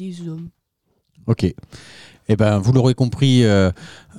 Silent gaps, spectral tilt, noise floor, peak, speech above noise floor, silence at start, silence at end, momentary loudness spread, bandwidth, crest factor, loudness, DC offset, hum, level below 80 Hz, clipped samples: none; -7 dB/octave; -69 dBFS; -2 dBFS; 51 dB; 0 s; 0 s; 19 LU; 11 kHz; 16 dB; -17 LUFS; under 0.1%; none; -46 dBFS; under 0.1%